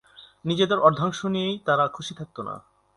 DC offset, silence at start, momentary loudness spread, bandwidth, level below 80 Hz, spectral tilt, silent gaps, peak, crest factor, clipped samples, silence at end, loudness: under 0.1%; 0.2 s; 16 LU; 11.5 kHz; -62 dBFS; -5.5 dB/octave; none; -2 dBFS; 22 dB; under 0.1%; 0.35 s; -23 LUFS